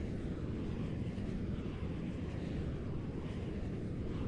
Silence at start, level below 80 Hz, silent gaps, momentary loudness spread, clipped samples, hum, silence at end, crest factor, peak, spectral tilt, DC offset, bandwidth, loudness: 0 s; -46 dBFS; none; 1 LU; under 0.1%; none; 0 s; 12 dB; -28 dBFS; -8.5 dB/octave; under 0.1%; 10.5 kHz; -41 LUFS